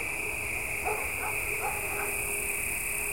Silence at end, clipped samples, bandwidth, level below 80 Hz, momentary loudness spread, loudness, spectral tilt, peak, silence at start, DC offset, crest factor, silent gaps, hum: 0 s; under 0.1%; 16.5 kHz; -48 dBFS; 2 LU; -30 LUFS; -2 dB/octave; -16 dBFS; 0 s; 0.4%; 16 dB; none; none